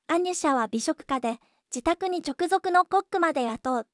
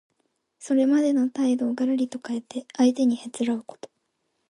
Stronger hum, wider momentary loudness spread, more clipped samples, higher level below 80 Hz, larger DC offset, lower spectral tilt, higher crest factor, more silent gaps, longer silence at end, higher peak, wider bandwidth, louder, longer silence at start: neither; second, 7 LU vs 12 LU; neither; first, -58 dBFS vs -76 dBFS; neither; second, -3 dB/octave vs -4.5 dB/octave; about the same, 16 dB vs 16 dB; neither; second, 0.1 s vs 0.65 s; about the same, -10 dBFS vs -8 dBFS; about the same, 12 kHz vs 11.5 kHz; about the same, -26 LUFS vs -24 LUFS; second, 0.1 s vs 0.6 s